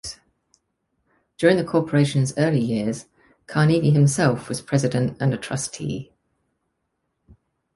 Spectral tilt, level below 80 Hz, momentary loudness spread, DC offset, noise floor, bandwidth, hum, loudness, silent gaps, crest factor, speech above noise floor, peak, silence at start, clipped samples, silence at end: -6 dB/octave; -56 dBFS; 11 LU; under 0.1%; -75 dBFS; 11.5 kHz; none; -21 LUFS; none; 20 dB; 55 dB; -4 dBFS; 0.05 s; under 0.1%; 1.7 s